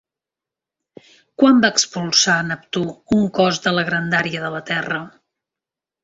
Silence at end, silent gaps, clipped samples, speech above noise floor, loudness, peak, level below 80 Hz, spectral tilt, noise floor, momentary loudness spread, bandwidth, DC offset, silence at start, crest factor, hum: 0.95 s; none; under 0.1%; 69 dB; -18 LUFS; -2 dBFS; -56 dBFS; -3.5 dB/octave; -87 dBFS; 11 LU; 8 kHz; under 0.1%; 1.4 s; 18 dB; none